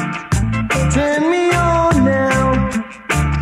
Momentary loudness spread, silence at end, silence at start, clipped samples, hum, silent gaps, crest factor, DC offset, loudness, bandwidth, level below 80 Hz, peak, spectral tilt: 6 LU; 0 s; 0 s; under 0.1%; none; none; 12 dB; under 0.1%; -16 LUFS; 15.5 kHz; -26 dBFS; -4 dBFS; -6 dB/octave